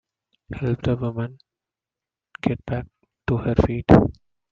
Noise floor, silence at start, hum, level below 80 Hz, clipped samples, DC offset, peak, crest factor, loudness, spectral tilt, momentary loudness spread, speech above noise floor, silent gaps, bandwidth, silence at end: -89 dBFS; 0.5 s; none; -40 dBFS; under 0.1%; under 0.1%; 0 dBFS; 22 dB; -22 LUFS; -9.5 dB/octave; 17 LU; 68 dB; none; 7.2 kHz; 0.4 s